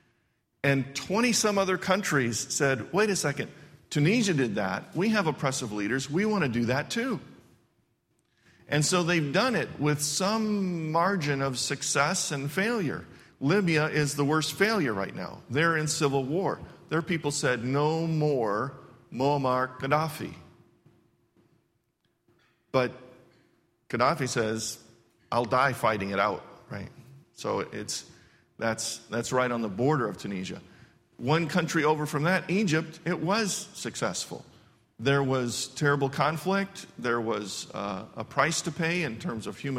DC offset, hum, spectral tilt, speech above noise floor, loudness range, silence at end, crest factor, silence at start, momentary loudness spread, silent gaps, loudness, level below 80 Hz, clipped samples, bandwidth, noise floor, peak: under 0.1%; none; -4.5 dB/octave; 47 dB; 5 LU; 0 s; 20 dB; 0.65 s; 10 LU; none; -28 LUFS; -64 dBFS; under 0.1%; 16 kHz; -75 dBFS; -8 dBFS